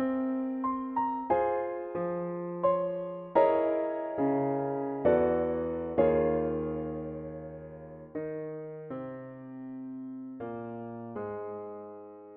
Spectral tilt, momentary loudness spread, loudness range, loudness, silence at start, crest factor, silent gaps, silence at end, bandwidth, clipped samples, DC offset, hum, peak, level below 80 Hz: -7.5 dB/octave; 17 LU; 12 LU; -31 LUFS; 0 s; 22 dB; none; 0 s; 4.1 kHz; under 0.1%; under 0.1%; none; -10 dBFS; -58 dBFS